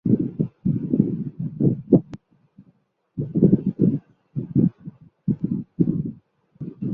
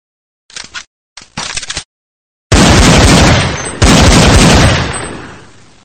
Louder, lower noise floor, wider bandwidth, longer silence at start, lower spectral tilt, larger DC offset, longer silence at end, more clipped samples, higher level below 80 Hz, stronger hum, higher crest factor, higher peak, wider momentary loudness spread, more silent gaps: second, -23 LUFS vs -7 LUFS; first, -62 dBFS vs -38 dBFS; second, 1.8 kHz vs 17 kHz; second, 0.05 s vs 0.55 s; first, -13.5 dB/octave vs -4 dB/octave; neither; second, 0 s vs 0.5 s; second, under 0.1% vs 1%; second, -52 dBFS vs -18 dBFS; neither; first, 22 dB vs 10 dB; about the same, -2 dBFS vs 0 dBFS; second, 18 LU vs 21 LU; second, none vs 0.87-1.16 s, 1.85-2.50 s